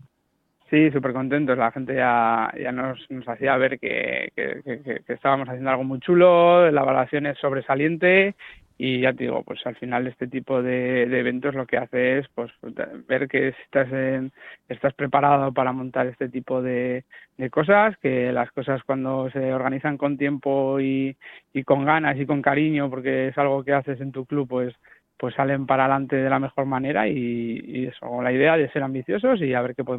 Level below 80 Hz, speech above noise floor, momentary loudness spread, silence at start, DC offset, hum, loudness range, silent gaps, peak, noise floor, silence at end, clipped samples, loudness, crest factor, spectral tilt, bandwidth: -62 dBFS; 49 dB; 12 LU; 0.7 s; under 0.1%; none; 5 LU; none; -4 dBFS; -71 dBFS; 0 s; under 0.1%; -22 LUFS; 18 dB; -9.5 dB/octave; 4.1 kHz